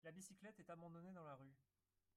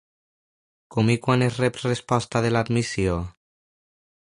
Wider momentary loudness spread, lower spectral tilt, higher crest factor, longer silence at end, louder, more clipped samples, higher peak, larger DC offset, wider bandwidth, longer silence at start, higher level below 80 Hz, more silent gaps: second, 4 LU vs 8 LU; about the same, -5.5 dB/octave vs -6 dB/octave; about the same, 16 dB vs 20 dB; second, 0.55 s vs 1.05 s; second, -60 LUFS vs -23 LUFS; neither; second, -46 dBFS vs -6 dBFS; neither; first, 13.5 kHz vs 11.5 kHz; second, 0.05 s vs 0.9 s; second, under -90 dBFS vs -46 dBFS; neither